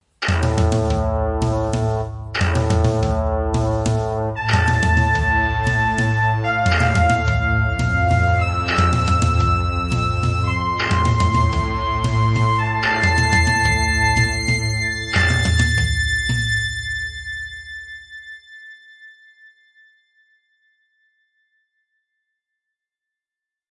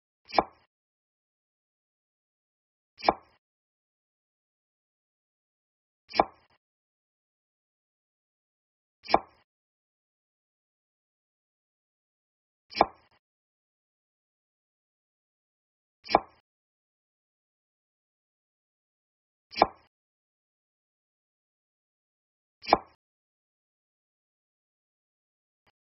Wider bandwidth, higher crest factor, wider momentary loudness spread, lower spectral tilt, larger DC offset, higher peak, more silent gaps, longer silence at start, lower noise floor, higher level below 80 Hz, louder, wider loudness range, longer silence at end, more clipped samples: first, 11 kHz vs 5.8 kHz; second, 16 dB vs 34 dB; second, 9 LU vs 15 LU; first, -5 dB/octave vs -1.5 dB/octave; neither; about the same, -4 dBFS vs -4 dBFS; second, none vs 0.67-2.97 s, 3.38-6.08 s, 6.57-9.03 s, 9.44-12.69 s, 13.19-16.03 s, 16.40-19.50 s, 19.87-22.61 s; about the same, 0.2 s vs 0.3 s; about the same, -88 dBFS vs under -90 dBFS; first, -30 dBFS vs -64 dBFS; first, -18 LUFS vs -29 LUFS; first, 7 LU vs 2 LU; first, 4.65 s vs 3.15 s; neither